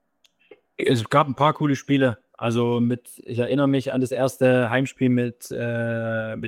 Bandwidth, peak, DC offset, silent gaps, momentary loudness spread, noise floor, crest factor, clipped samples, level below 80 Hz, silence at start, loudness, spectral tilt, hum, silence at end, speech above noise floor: 15.5 kHz; -6 dBFS; under 0.1%; none; 8 LU; -64 dBFS; 18 dB; under 0.1%; -64 dBFS; 0.8 s; -22 LUFS; -6.5 dB/octave; none; 0 s; 42 dB